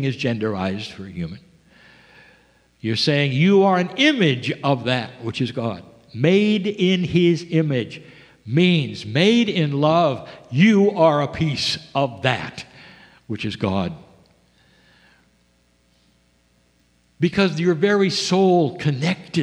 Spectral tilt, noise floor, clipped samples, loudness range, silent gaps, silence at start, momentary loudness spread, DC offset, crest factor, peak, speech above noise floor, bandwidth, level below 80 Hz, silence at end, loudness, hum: -6 dB/octave; -61 dBFS; under 0.1%; 12 LU; none; 0 s; 15 LU; under 0.1%; 20 dB; 0 dBFS; 42 dB; 10.5 kHz; -56 dBFS; 0 s; -19 LUFS; 60 Hz at -45 dBFS